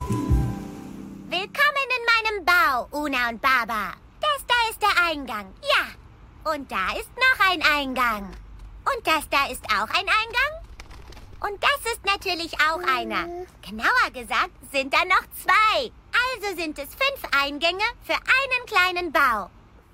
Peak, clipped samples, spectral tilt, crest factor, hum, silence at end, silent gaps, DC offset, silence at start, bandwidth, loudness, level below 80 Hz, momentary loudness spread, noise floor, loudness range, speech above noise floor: -4 dBFS; under 0.1%; -3.5 dB/octave; 20 dB; none; 0.45 s; none; under 0.1%; 0 s; 16 kHz; -22 LUFS; -42 dBFS; 12 LU; -46 dBFS; 2 LU; 23 dB